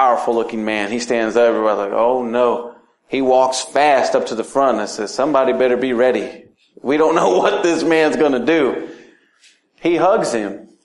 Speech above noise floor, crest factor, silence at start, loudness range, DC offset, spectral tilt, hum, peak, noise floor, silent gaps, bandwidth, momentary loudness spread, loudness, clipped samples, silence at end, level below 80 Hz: 38 dB; 16 dB; 0 s; 1 LU; under 0.1%; -4 dB/octave; none; -2 dBFS; -54 dBFS; none; 11.5 kHz; 9 LU; -16 LUFS; under 0.1%; 0.2 s; -58 dBFS